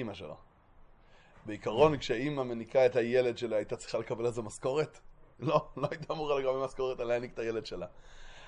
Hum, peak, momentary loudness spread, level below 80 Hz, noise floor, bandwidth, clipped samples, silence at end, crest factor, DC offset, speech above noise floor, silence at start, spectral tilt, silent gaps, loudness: none; -12 dBFS; 15 LU; -58 dBFS; -59 dBFS; 11 kHz; under 0.1%; 0 s; 22 dB; under 0.1%; 26 dB; 0 s; -6 dB/octave; none; -32 LUFS